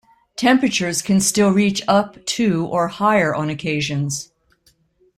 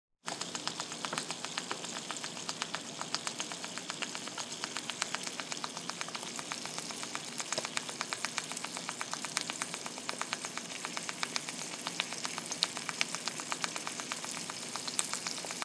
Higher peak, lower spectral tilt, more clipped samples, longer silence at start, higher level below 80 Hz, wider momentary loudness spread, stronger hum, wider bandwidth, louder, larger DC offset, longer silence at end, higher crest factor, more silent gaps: first, -2 dBFS vs -6 dBFS; first, -4.5 dB/octave vs -1 dB/octave; neither; first, 0.4 s vs 0.25 s; first, -54 dBFS vs -88 dBFS; first, 8 LU vs 5 LU; neither; first, 15 kHz vs 11 kHz; first, -18 LUFS vs -37 LUFS; neither; first, 0.95 s vs 0 s; second, 16 dB vs 34 dB; neither